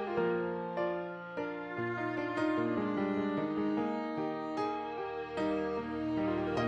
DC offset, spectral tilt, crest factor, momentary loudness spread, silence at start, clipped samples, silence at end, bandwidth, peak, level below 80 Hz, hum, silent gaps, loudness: under 0.1%; -7.5 dB/octave; 14 dB; 6 LU; 0 s; under 0.1%; 0 s; 8.2 kHz; -20 dBFS; -62 dBFS; none; none; -35 LUFS